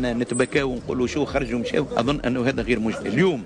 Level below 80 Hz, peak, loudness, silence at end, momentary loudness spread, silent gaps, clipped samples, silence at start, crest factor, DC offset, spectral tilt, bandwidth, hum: -40 dBFS; -8 dBFS; -23 LUFS; 0 s; 3 LU; none; under 0.1%; 0 s; 14 dB; under 0.1%; -5.5 dB/octave; 10.5 kHz; none